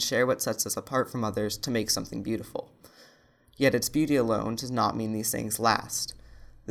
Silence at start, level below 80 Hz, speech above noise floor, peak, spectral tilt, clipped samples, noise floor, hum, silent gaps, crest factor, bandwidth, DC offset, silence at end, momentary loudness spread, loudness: 0 s; -56 dBFS; 32 dB; -6 dBFS; -3.5 dB/octave; under 0.1%; -60 dBFS; none; none; 22 dB; 18.5 kHz; under 0.1%; 0 s; 8 LU; -28 LUFS